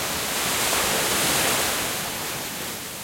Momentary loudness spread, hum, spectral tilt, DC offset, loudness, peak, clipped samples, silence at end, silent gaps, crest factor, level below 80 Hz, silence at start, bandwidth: 9 LU; none; -1 dB/octave; under 0.1%; -22 LUFS; -10 dBFS; under 0.1%; 0 s; none; 16 dB; -50 dBFS; 0 s; 16.5 kHz